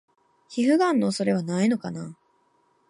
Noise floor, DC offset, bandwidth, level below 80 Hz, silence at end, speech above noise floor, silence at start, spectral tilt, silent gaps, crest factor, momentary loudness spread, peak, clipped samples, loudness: -66 dBFS; under 0.1%; 11.5 kHz; -72 dBFS; 0.75 s; 43 dB; 0.5 s; -6 dB/octave; none; 16 dB; 15 LU; -10 dBFS; under 0.1%; -24 LUFS